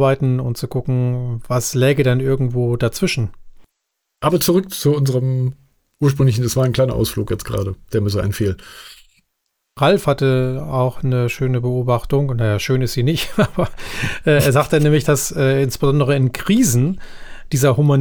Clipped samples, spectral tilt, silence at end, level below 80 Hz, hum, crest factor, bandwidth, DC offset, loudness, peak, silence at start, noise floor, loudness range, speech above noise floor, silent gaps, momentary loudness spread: under 0.1%; -6 dB/octave; 0 s; -38 dBFS; none; 14 dB; over 20 kHz; under 0.1%; -18 LUFS; -4 dBFS; 0 s; -75 dBFS; 4 LU; 58 dB; none; 8 LU